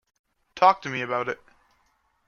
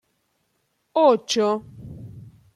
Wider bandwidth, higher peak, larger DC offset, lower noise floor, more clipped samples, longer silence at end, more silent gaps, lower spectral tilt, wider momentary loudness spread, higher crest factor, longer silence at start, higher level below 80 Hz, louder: second, 7 kHz vs 12.5 kHz; about the same, -4 dBFS vs -6 dBFS; neither; about the same, -68 dBFS vs -71 dBFS; neither; first, 0.95 s vs 0.35 s; neither; about the same, -4.5 dB/octave vs -4.5 dB/octave; second, 12 LU vs 23 LU; about the same, 22 dB vs 20 dB; second, 0.55 s vs 0.95 s; second, -70 dBFS vs -58 dBFS; second, -24 LUFS vs -21 LUFS